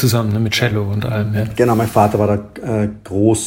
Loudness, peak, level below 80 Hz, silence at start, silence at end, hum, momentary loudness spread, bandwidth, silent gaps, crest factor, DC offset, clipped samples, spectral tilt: -17 LUFS; 0 dBFS; -44 dBFS; 0 s; 0 s; none; 6 LU; 16.5 kHz; none; 16 dB; under 0.1%; under 0.1%; -6 dB/octave